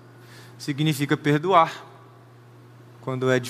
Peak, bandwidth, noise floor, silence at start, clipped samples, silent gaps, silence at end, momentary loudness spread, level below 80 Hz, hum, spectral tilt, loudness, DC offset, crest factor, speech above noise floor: -4 dBFS; 15.5 kHz; -49 dBFS; 0.3 s; under 0.1%; none; 0 s; 17 LU; -72 dBFS; none; -6 dB/octave; -22 LUFS; under 0.1%; 22 dB; 27 dB